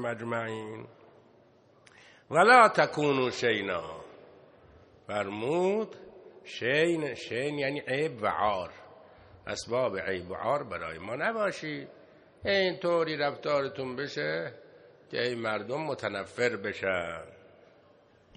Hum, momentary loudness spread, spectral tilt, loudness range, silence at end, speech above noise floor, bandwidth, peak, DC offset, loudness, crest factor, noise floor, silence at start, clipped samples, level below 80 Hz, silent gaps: none; 13 LU; -5 dB/octave; 7 LU; 1 s; 32 dB; 10 kHz; -6 dBFS; under 0.1%; -29 LUFS; 26 dB; -61 dBFS; 0 s; under 0.1%; -68 dBFS; none